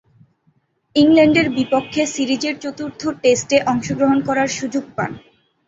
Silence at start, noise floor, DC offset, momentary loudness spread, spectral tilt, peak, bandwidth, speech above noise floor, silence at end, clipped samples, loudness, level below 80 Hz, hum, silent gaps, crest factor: 0.95 s; -62 dBFS; under 0.1%; 13 LU; -4.5 dB/octave; -2 dBFS; 8 kHz; 45 dB; 0.5 s; under 0.1%; -18 LUFS; -54 dBFS; none; none; 16 dB